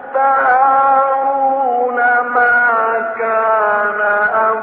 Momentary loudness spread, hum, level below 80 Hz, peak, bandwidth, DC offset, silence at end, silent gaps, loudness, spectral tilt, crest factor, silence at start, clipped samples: 5 LU; none; -60 dBFS; -2 dBFS; 4.5 kHz; under 0.1%; 0 s; none; -13 LUFS; -1.5 dB/octave; 12 dB; 0 s; under 0.1%